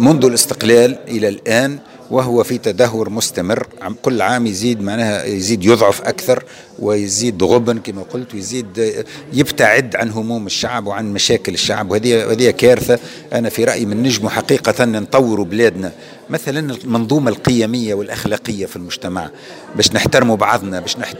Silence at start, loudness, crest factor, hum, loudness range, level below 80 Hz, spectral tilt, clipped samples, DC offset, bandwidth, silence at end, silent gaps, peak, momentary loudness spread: 0 s; -15 LUFS; 16 dB; none; 3 LU; -48 dBFS; -4 dB/octave; 0.2%; under 0.1%; 16.5 kHz; 0 s; none; 0 dBFS; 12 LU